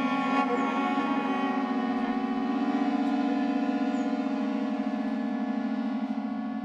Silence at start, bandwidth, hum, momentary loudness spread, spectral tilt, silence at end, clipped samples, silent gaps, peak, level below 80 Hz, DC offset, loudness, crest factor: 0 s; 7.8 kHz; none; 4 LU; -6.5 dB/octave; 0 s; under 0.1%; none; -14 dBFS; -70 dBFS; under 0.1%; -28 LUFS; 14 dB